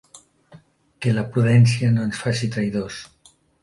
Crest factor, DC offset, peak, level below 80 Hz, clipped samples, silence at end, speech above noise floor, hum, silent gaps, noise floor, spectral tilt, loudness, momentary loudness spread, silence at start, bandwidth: 16 dB; under 0.1%; -4 dBFS; -54 dBFS; under 0.1%; 0.55 s; 31 dB; none; none; -50 dBFS; -6.5 dB/octave; -20 LUFS; 12 LU; 1 s; 11.5 kHz